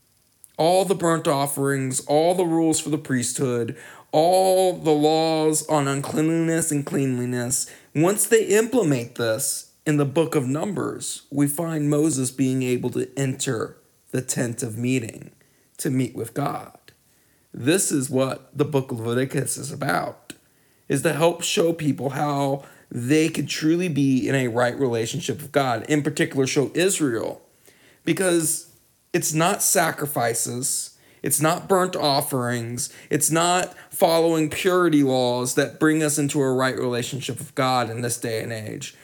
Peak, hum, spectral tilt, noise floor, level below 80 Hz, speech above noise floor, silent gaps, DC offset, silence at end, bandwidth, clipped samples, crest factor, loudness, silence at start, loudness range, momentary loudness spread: -4 dBFS; none; -4.5 dB/octave; -60 dBFS; -66 dBFS; 38 dB; none; under 0.1%; 0.1 s; 19.5 kHz; under 0.1%; 20 dB; -22 LUFS; 0.6 s; 5 LU; 9 LU